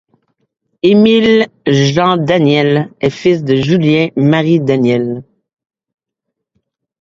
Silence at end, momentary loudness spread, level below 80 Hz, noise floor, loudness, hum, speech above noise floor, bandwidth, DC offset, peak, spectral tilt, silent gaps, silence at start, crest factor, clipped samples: 1.8 s; 6 LU; -50 dBFS; -76 dBFS; -11 LUFS; none; 66 dB; 7.6 kHz; under 0.1%; 0 dBFS; -7 dB/octave; none; 0.85 s; 12 dB; under 0.1%